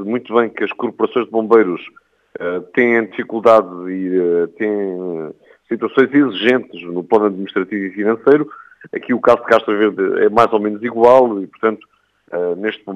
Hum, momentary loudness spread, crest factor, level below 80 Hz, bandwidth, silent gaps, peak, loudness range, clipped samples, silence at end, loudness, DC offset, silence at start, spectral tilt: none; 14 LU; 16 dB; -62 dBFS; 7.8 kHz; none; 0 dBFS; 3 LU; under 0.1%; 0 s; -16 LUFS; under 0.1%; 0 s; -7 dB/octave